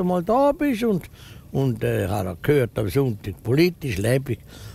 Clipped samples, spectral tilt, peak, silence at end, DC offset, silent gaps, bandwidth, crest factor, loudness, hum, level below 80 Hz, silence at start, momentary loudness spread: under 0.1%; -7 dB/octave; -6 dBFS; 0 s; under 0.1%; none; 16 kHz; 16 dB; -23 LUFS; none; -46 dBFS; 0 s; 10 LU